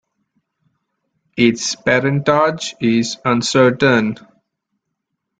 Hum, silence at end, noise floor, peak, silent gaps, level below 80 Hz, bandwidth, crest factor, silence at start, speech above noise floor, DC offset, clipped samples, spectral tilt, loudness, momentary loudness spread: none; 1.25 s; -76 dBFS; -2 dBFS; none; -56 dBFS; 9.4 kHz; 16 dB; 1.35 s; 61 dB; under 0.1%; under 0.1%; -4.5 dB/octave; -16 LUFS; 7 LU